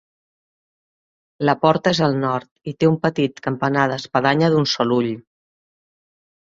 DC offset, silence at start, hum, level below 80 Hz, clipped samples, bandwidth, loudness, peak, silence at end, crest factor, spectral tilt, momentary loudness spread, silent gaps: under 0.1%; 1.4 s; none; -58 dBFS; under 0.1%; 7.6 kHz; -19 LUFS; -2 dBFS; 1.35 s; 20 dB; -6 dB/octave; 7 LU; 2.51-2.56 s